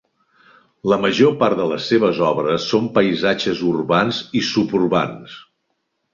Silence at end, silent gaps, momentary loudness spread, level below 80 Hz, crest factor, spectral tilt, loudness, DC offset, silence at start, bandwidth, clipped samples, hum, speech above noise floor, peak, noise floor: 0.7 s; none; 6 LU; -56 dBFS; 18 dB; -5.5 dB/octave; -18 LUFS; under 0.1%; 0.85 s; 7.4 kHz; under 0.1%; none; 54 dB; -2 dBFS; -72 dBFS